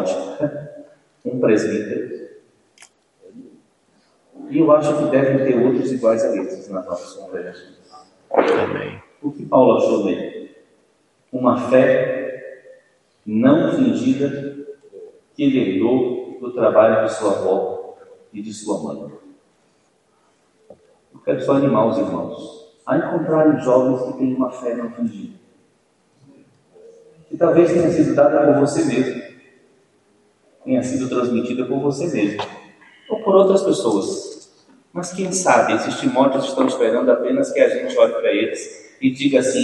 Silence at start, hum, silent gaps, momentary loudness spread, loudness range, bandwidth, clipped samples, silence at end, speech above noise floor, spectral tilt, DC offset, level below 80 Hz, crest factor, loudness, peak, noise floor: 0 s; none; none; 18 LU; 7 LU; 11.5 kHz; under 0.1%; 0 s; 43 dB; -6 dB/octave; under 0.1%; -66 dBFS; 18 dB; -18 LUFS; 0 dBFS; -61 dBFS